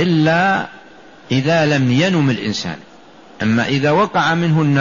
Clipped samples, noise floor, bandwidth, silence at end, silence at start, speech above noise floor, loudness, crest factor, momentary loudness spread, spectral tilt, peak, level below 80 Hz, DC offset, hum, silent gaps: under 0.1%; -42 dBFS; 7.4 kHz; 0 s; 0 s; 27 dB; -16 LUFS; 12 dB; 9 LU; -6 dB/octave; -4 dBFS; -52 dBFS; 0.3%; none; none